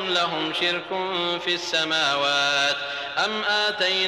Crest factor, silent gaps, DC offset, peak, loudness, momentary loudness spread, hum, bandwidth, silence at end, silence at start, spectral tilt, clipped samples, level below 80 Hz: 14 dB; none; under 0.1%; -10 dBFS; -22 LUFS; 5 LU; none; 15.5 kHz; 0 s; 0 s; -2 dB/octave; under 0.1%; -70 dBFS